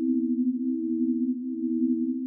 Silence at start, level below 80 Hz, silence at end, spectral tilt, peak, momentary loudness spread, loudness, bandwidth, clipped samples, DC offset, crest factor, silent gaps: 0 s; under -90 dBFS; 0 s; -15.5 dB/octave; -16 dBFS; 3 LU; -27 LUFS; 0.5 kHz; under 0.1%; under 0.1%; 10 dB; none